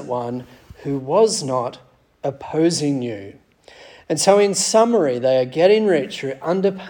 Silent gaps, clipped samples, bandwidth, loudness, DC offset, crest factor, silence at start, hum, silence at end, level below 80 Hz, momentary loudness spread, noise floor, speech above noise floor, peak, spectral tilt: none; under 0.1%; 18 kHz; -19 LUFS; under 0.1%; 18 dB; 0 s; none; 0 s; -60 dBFS; 14 LU; -46 dBFS; 28 dB; -2 dBFS; -4.5 dB/octave